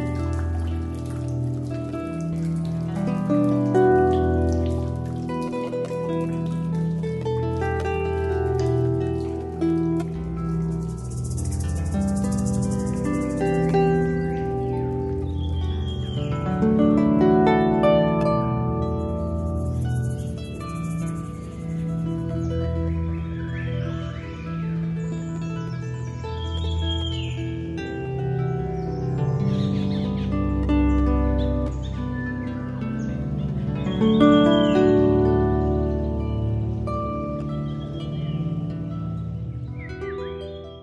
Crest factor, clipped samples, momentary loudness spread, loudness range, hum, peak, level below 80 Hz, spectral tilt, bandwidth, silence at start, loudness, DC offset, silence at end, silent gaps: 20 dB; under 0.1%; 11 LU; 8 LU; none; -4 dBFS; -34 dBFS; -7.5 dB/octave; 11.5 kHz; 0 s; -24 LUFS; under 0.1%; 0 s; none